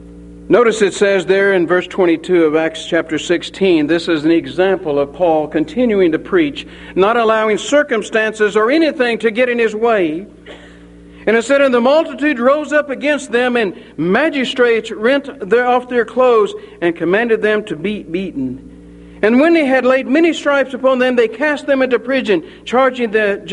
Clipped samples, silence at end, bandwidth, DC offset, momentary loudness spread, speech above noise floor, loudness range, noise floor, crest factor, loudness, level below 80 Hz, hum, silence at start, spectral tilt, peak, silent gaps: under 0.1%; 0 s; 11 kHz; under 0.1%; 6 LU; 24 dB; 2 LU; -38 dBFS; 14 dB; -14 LUFS; -48 dBFS; none; 0 s; -5 dB/octave; 0 dBFS; none